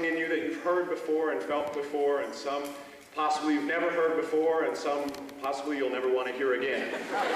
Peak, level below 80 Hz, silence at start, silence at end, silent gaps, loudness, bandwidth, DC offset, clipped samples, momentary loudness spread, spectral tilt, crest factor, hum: -18 dBFS; -72 dBFS; 0 s; 0 s; none; -30 LUFS; 15 kHz; under 0.1%; under 0.1%; 7 LU; -4 dB/octave; 12 dB; none